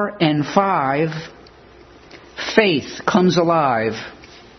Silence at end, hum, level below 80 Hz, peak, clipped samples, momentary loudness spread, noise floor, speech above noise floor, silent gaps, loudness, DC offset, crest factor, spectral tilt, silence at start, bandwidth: 0.2 s; none; -54 dBFS; 0 dBFS; under 0.1%; 16 LU; -45 dBFS; 27 dB; none; -18 LUFS; under 0.1%; 20 dB; -5.5 dB/octave; 0 s; 6.4 kHz